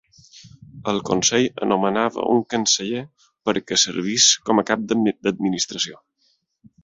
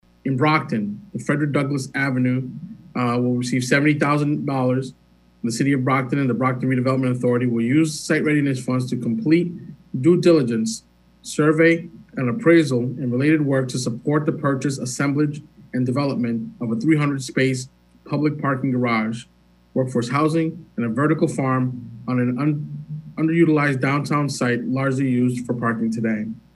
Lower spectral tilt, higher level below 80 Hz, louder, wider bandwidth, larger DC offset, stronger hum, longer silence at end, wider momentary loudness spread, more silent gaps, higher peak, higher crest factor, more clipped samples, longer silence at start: second, -2.5 dB/octave vs -6.5 dB/octave; about the same, -58 dBFS vs -60 dBFS; about the same, -20 LUFS vs -21 LUFS; second, 8 kHz vs 12.5 kHz; neither; neither; first, 0.9 s vs 0.2 s; about the same, 11 LU vs 11 LU; neither; first, -2 dBFS vs -6 dBFS; about the same, 20 dB vs 16 dB; neither; about the same, 0.35 s vs 0.25 s